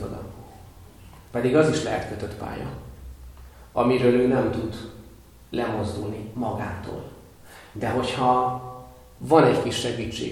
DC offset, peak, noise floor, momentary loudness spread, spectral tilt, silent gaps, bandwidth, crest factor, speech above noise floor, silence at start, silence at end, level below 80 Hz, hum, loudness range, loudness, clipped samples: under 0.1%; -2 dBFS; -48 dBFS; 22 LU; -6 dB/octave; none; 18 kHz; 22 dB; 25 dB; 0 s; 0 s; -48 dBFS; none; 6 LU; -24 LUFS; under 0.1%